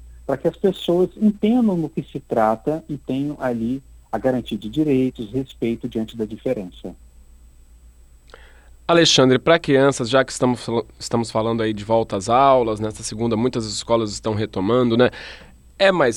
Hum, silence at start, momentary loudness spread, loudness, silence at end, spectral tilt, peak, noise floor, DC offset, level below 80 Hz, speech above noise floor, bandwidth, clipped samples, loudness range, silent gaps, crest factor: none; 0 s; 12 LU; -20 LUFS; 0 s; -5 dB/octave; -4 dBFS; -47 dBFS; under 0.1%; -46 dBFS; 28 dB; 15.5 kHz; under 0.1%; 7 LU; none; 18 dB